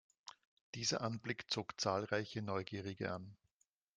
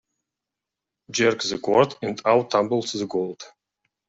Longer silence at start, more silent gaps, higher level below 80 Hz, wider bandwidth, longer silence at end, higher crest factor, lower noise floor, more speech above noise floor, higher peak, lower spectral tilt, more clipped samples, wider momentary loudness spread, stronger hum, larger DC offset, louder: second, 0.25 s vs 1.1 s; first, 0.47-0.73 s vs none; second, -78 dBFS vs -66 dBFS; first, 10 kHz vs 8 kHz; about the same, 0.6 s vs 0.6 s; about the same, 22 dB vs 20 dB; about the same, -83 dBFS vs -86 dBFS; second, 42 dB vs 64 dB; second, -20 dBFS vs -4 dBFS; about the same, -4 dB/octave vs -4 dB/octave; neither; first, 20 LU vs 9 LU; neither; neither; second, -41 LUFS vs -23 LUFS